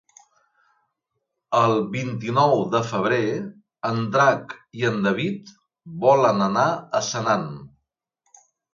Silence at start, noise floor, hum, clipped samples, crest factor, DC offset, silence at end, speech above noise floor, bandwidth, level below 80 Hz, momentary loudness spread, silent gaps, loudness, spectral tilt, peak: 1.5 s; -79 dBFS; none; under 0.1%; 20 dB; under 0.1%; 1.05 s; 58 dB; 7.6 kHz; -64 dBFS; 13 LU; none; -22 LUFS; -5.5 dB/octave; -4 dBFS